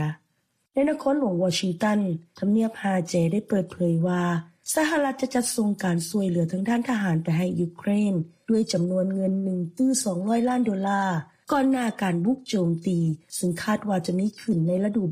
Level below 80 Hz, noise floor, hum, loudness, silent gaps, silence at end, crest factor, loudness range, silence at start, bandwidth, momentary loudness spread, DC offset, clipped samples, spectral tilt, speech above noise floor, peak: -62 dBFS; -72 dBFS; none; -25 LUFS; none; 0 s; 14 dB; 1 LU; 0 s; 15.5 kHz; 4 LU; under 0.1%; under 0.1%; -6 dB/octave; 48 dB; -10 dBFS